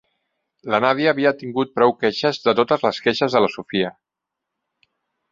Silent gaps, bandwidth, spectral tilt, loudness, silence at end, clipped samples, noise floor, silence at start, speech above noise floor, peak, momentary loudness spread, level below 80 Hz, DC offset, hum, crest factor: none; 7.6 kHz; -5.5 dB/octave; -19 LUFS; 1.4 s; under 0.1%; -84 dBFS; 0.65 s; 65 dB; -2 dBFS; 6 LU; -64 dBFS; under 0.1%; none; 20 dB